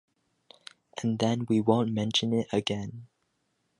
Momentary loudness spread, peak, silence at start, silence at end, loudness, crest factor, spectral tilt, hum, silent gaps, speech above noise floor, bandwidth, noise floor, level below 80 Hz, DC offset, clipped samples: 14 LU; -10 dBFS; 0.95 s; 0.75 s; -28 LUFS; 20 dB; -5.5 dB/octave; none; none; 49 dB; 11.5 kHz; -76 dBFS; -64 dBFS; under 0.1%; under 0.1%